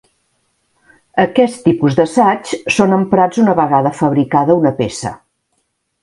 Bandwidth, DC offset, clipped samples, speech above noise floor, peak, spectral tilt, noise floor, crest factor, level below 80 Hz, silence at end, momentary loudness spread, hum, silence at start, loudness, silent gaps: 11.5 kHz; under 0.1%; under 0.1%; 54 dB; 0 dBFS; -6.5 dB/octave; -66 dBFS; 14 dB; -50 dBFS; 0.85 s; 8 LU; none; 1.15 s; -13 LUFS; none